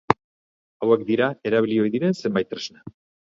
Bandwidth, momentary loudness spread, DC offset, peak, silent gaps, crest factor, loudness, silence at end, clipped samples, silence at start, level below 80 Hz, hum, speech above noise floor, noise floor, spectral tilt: 7.6 kHz; 9 LU; under 0.1%; 0 dBFS; 0.24-0.80 s; 22 dB; -23 LUFS; 0.35 s; under 0.1%; 0.1 s; -58 dBFS; none; over 68 dB; under -90 dBFS; -6.5 dB/octave